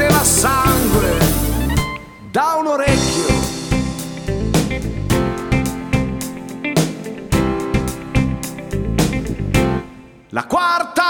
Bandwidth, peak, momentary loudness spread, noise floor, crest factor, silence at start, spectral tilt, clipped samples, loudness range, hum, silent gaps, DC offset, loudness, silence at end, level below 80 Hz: 19 kHz; 0 dBFS; 11 LU; -39 dBFS; 16 dB; 0 s; -4.5 dB/octave; under 0.1%; 4 LU; none; none; under 0.1%; -18 LUFS; 0 s; -28 dBFS